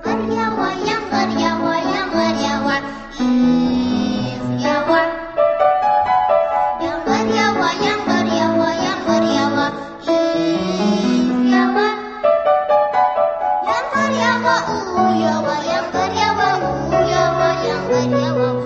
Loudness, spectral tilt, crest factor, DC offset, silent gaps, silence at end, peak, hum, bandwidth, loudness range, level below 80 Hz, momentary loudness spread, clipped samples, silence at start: -17 LUFS; -5 dB/octave; 14 dB; under 0.1%; none; 0 s; -2 dBFS; none; 8 kHz; 2 LU; -46 dBFS; 5 LU; under 0.1%; 0 s